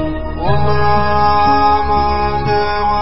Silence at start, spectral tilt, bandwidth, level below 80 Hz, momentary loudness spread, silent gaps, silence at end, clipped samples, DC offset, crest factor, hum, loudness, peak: 0 s; -10 dB/octave; 5.8 kHz; -26 dBFS; 5 LU; none; 0 s; under 0.1%; under 0.1%; 12 dB; none; -14 LUFS; -2 dBFS